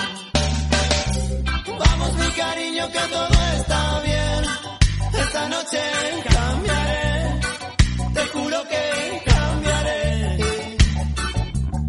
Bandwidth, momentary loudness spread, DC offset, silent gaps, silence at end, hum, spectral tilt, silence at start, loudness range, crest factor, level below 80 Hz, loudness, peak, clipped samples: 11.5 kHz; 5 LU; under 0.1%; none; 0 s; none; -4.5 dB/octave; 0 s; 1 LU; 20 dB; -24 dBFS; -21 LUFS; 0 dBFS; under 0.1%